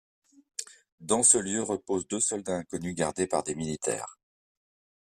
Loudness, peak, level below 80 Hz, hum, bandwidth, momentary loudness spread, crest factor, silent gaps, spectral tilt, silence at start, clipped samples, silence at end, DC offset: -27 LUFS; -8 dBFS; -64 dBFS; none; 14 kHz; 19 LU; 24 dB; 0.92-0.98 s; -3 dB/octave; 0.6 s; under 0.1%; 0.9 s; under 0.1%